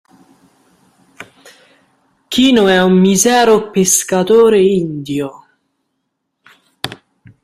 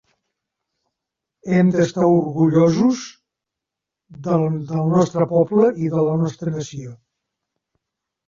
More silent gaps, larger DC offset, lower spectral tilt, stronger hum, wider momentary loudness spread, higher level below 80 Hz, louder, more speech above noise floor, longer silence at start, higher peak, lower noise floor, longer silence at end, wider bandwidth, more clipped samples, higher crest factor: neither; neither; second, -4 dB/octave vs -7.5 dB/octave; neither; about the same, 17 LU vs 16 LU; first, -52 dBFS vs -58 dBFS; first, -11 LUFS vs -18 LUFS; second, 60 dB vs 67 dB; second, 1.2 s vs 1.45 s; first, 0 dBFS vs -4 dBFS; second, -71 dBFS vs -85 dBFS; second, 0.5 s vs 1.35 s; first, 15 kHz vs 7.6 kHz; neither; about the same, 14 dB vs 16 dB